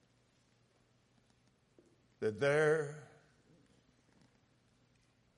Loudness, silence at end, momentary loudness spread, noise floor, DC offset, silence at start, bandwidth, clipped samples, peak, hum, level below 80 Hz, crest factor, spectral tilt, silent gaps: -34 LUFS; 2.3 s; 15 LU; -73 dBFS; under 0.1%; 2.2 s; 11 kHz; under 0.1%; -20 dBFS; none; -80 dBFS; 20 dB; -5.5 dB/octave; none